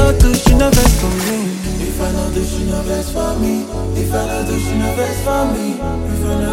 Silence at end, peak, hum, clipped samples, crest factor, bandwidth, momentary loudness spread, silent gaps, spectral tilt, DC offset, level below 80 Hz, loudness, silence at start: 0 s; 0 dBFS; none; under 0.1%; 14 dB; 17 kHz; 9 LU; none; -5.5 dB/octave; under 0.1%; -18 dBFS; -16 LUFS; 0 s